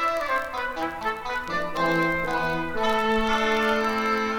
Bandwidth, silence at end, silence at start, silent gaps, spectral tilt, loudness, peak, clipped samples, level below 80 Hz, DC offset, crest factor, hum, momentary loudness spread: 19 kHz; 0 s; 0 s; none; -4.5 dB/octave; -25 LUFS; -10 dBFS; under 0.1%; -44 dBFS; under 0.1%; 16 dB; none; 6 LU